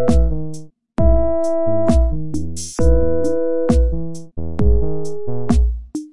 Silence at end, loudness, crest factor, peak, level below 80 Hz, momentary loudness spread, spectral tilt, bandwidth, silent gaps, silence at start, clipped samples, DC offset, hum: 0 s; -19 LUFS; 14 dB; -2 dBFS; -20 dBFS; 12 LU; -7.5 dB/octave; 11.5 kHz; none; 0 s; under 0.1%; 10%; none